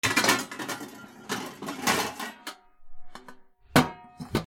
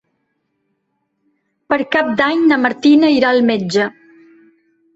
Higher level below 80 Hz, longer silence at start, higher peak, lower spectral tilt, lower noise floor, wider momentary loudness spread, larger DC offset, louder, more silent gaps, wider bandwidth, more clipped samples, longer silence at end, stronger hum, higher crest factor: first, -54 dBFS vs -60 dBFS; second, 0.05 s vs 1.7 s; about the same, -4 dBFS vs -2 dBFS; second, -3 dB/octave vs -5.5 dB/octave; second, -50 dBFS vs -69 dBFS; first, 21 LU vs 8 LU; neither; second, -28 LUFS vs -14 LUFS; neither; first, over 20 kHz vs 8 kHz; neither; second, 0 s vs 1.05 s; neither; first, 26 dB vs 14 dB